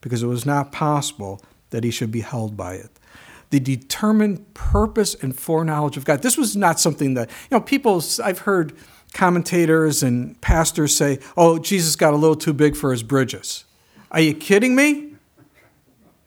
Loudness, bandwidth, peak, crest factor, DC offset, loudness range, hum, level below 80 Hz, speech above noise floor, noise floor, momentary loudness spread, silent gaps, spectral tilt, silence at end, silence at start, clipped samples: -19 LUFS; over 20 kHz; 0 dBFS; 20 dB; under 0.1%; 6 LU; none; -36 dBFS; 38 dB; -57 dBFS; 12 LU; none; -4.5 dB/octave; 1.15 s; 0.05 s; under 0.1%